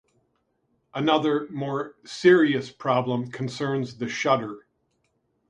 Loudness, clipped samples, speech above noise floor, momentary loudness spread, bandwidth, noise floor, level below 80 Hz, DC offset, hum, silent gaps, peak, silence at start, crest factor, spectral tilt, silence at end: -24 LUFS; under 0.1%; 48 dB; 14 LU; 9.6 kHz; -72 dBFS; -70 dBFS; under 0.1%; none; none; -6 dBFS; 0.95 s; 20 dB; -6 dB/octave; 0.9 s